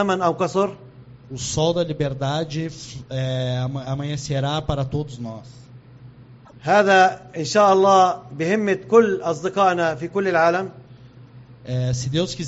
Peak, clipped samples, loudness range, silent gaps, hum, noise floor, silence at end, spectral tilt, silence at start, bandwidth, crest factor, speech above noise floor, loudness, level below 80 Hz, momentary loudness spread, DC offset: -4 dBFS; under 0.1%; 9 LU; none; none; -45 dBFS; 0 s; -4.5 dB/octave; 0 s; 8 kHz; 18 dB; 25 dB; -20 LUFS; -48 dBFS; 15 LU; under 0.1%